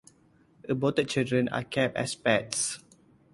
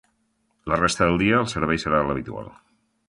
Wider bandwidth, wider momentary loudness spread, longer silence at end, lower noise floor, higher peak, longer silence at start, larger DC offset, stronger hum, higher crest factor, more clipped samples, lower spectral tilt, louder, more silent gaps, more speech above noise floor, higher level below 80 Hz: about the same, 11.5 kHz vs 11.5 kHz; second, 7 LU vs 17 LU; about the same, 0.55 s vs 0.55 s; second, -62 dBFS vs -69 dBFS; second, -8 dBFS vs -4 dBFS; about the same, 0.65 s vs 0.65 s; neither; neither; about the same, 22 dB vs 20 dB; neither; about the same, -4 dB/octave vs -5 dB/octave; second, -28 LUFS vs -22 LUFS; neither; second, 34 dB vs 47 dB; second, -64 dBFS vs -44 dBFS